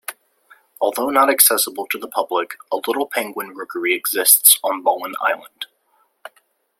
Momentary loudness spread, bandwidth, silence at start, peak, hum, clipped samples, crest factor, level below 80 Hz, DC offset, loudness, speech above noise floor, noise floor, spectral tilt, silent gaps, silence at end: 17 LU; 16.5 kHz; 0.1 s; 0 dBFS; none; under 0.1%; 20 dB; -74 dBFS; under 0.1%; -17 LUFS; 44 dB; -63 dBFS; 0.5 dB/octave; none; 1.15 s